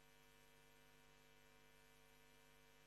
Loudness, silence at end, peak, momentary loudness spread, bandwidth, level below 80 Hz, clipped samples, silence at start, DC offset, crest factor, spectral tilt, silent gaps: -70 LUFS; 0 s; -54 dBFS; 0 LU; 12.5 kHz; -82 dBFS; under 0.1%; 0 s; under 0.1%; 16 dB; -3 dB/octave; none